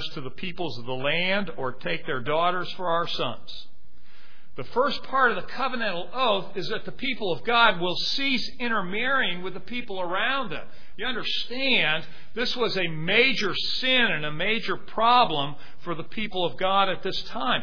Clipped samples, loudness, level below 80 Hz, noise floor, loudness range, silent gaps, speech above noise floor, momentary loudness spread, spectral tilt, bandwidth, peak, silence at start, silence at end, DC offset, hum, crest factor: under 0.1%; -25 LUFS; -54 dBFS; -57 dBFS; 5 LU; none; 30 dB; 13 LU; -4.5 dB/octave; 5.4 kHz; -4 dBFS; 0 s; 0 s; 4%; none; 22 dB